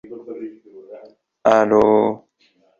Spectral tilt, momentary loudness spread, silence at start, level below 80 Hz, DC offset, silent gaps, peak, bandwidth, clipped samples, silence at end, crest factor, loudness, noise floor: -6.5 dB/octave; 20 LU; 0.1 s; -56 dBFS; under 0.1%; none; 0 dBFS; 7.4 kHz; under 0.1%; 0.65 s; 20 dB; -16 LUFS; -60 dBFS